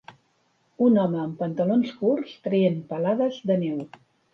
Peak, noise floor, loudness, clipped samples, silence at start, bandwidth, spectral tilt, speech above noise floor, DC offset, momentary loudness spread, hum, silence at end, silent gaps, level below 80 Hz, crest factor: -10 dBFS; -67 dBFS; -24 LUFS; under 0.1%; 0.1 s; 6.6 kHz; -9 dB/octave; 44 dB; under 0.1%; 8 LU; none; 0.45 s; none; -72 dBFS; 16 dB